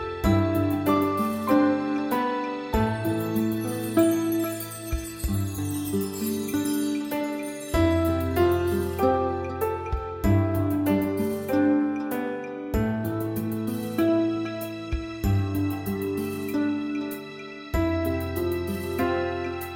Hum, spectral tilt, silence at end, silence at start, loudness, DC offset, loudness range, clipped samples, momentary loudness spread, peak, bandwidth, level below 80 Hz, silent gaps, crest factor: none; -6.5 dB/octave; 0 s; 0 s; -26 LUFS; under 0.1%; 4 LU; under 0.1%; 8 LU; -8 dBFS; 17 kHz; -40 dBFS; none; 16 dB